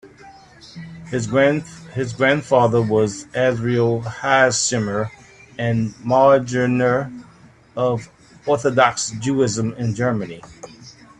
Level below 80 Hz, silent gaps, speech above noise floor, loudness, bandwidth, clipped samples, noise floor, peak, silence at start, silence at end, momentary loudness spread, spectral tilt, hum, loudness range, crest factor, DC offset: -54 dBFS; none; 29 dB; -19 LUFS; 10.5 kHz; under 0.1%; -48 dBFS; 0 dBFS; 0.05 s; 0.3 s; 17 LU; -5 dB/octave; none; 3 LU; 20 dB; under 0.1%